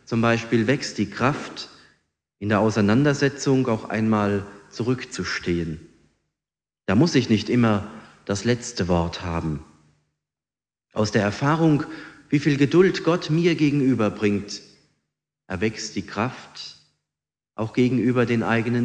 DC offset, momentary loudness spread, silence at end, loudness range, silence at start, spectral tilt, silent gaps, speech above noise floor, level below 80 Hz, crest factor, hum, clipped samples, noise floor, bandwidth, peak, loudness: under 0.1%; 16 LU; 0 s; 6 LU; 0.1 s; -6 dB/octave; none; over 68 dB; -50 dBFS; 18 dB; none; under 0.1%; under -90 dBFS; 9.8 kHz; -4 dBFS; -22 LUFS